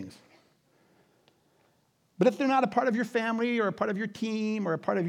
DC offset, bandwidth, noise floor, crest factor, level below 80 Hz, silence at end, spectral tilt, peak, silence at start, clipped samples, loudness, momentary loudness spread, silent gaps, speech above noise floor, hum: under 0.1%; 12.5 kHz; -69 dBFS; 20 dB; -82 dBFS; 0 s; -6.5 dB/octave; -10 dBFS; 0 s; under 0.1%; -28 LUFS; 6 LU; none; 42 dB; none